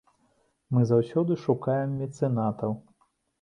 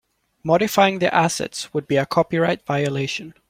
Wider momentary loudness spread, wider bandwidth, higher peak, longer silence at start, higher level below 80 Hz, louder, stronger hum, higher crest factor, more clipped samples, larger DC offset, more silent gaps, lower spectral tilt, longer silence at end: about the same, 9 LU vs 9 LU; second, 9.4 kHz vs 16.5 kHz; second, -10 dBFS vs -2 dBFS; first, 0.7 s vs 0.45 s; second, -64 dBFS vs -58 dBFS; second, -27 LUFS vs -20 LUFS; neither; about the same, 18 dB vs 18 dB; neither; neither; neither; first, -9.5 dB/octave vs -5 dB/octave; first, 0.6 s vs 0.2 s